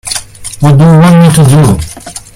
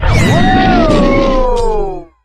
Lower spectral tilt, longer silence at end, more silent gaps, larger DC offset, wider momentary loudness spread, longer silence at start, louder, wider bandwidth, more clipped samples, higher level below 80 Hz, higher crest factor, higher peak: about the same, -6.5 dB/octave vs -6.5 dB/octave; about the same, 0.15 s vs 0.2 s; neither; neither; first, 18 LU vs 7 LU; about the same, 0.05 s vs 0 s; first, -5 LUFS vs -11 LUFS; first, 15.5 kHz vs 12.5 kHz; first, 3% vs under 0.1%; second, -30 dBFS vs -16 dBFS; about the same, 6 dB vs 10 dB; about the same, 0 dBFS vs 0 dBFS